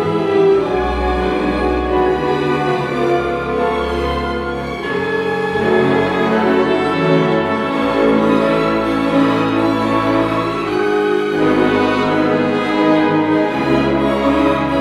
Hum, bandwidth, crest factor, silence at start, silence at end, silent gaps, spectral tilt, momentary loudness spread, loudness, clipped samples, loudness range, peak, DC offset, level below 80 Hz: none; 13 kHz; 14 dB; 0 s; 0 s; none; -7 dB/octave; 4 LU; -15 LUFS; under 0.1%; 3 LU; 0 dBFS; under 0.1%; -34 dBFS